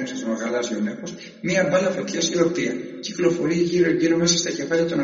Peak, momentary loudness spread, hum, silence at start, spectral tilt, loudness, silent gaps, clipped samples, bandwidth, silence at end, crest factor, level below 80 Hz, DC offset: -4 dBFS; 10 LU; none; 0 s; -4.5 dB/octave; -22 LUFS; none; under 0.1%; 7.6 kHz; 0 s; 16 dB; -58 dBFS; under 0.1%